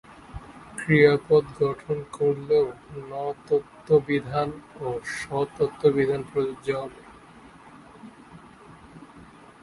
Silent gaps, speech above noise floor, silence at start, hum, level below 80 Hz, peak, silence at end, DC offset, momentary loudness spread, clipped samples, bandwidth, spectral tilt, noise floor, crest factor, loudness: none; 25 dB; 0.1 s; none; -56 dBFS; -4 dBFS; 0.4 s; under 0.1%; 20 LU; under 0.1%; 11.5 kHz; -6.5 dB/octave; -49 dBFS; 22 dB; -25 LUFS